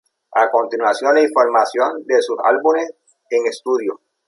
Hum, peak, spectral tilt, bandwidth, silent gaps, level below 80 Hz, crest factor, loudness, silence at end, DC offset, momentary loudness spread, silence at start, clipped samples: none; -2 dBFS; -2.5 dB/octave; 11.5 kHz; none; -74 dBFS; 16 dB; -17 LUFS; 0.3 s; under 0.1%; 7 LU; 0.3 s; under 0.1%